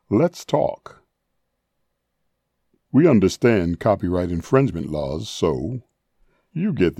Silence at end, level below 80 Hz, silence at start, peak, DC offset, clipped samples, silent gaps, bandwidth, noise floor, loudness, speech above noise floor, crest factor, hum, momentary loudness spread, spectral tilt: 0.05 s; -48 dBFS; 0.1 s; -4 dBFS; under 0.1%; under 0.1%; none; 14 kHz; -74 dBFS; -21 LUFS; 55 dB; 18 dB; none; 11 LU; -7 dB/octave